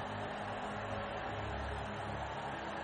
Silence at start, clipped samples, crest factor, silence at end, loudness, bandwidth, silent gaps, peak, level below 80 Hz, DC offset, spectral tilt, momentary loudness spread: 0 s; under 0.1%; 12 dB; 0 s; -41 LUFS; 9.4 kHz; none; -28 dBFS; -52 dBFS; under 0.1%; -5.5 dB/octave; 1 LU